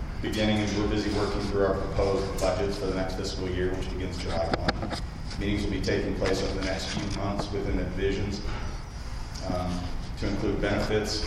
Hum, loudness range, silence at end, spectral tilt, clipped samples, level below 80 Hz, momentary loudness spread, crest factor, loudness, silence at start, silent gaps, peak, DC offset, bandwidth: none; 4 LU; 0 s; -5.5 dB/octave; under 0.1%; -34 dBFS; 8 LU; 22 dB; -29 LUFS; 0 s; none; -8 dBFS; under 0.1%; 14.5 kHz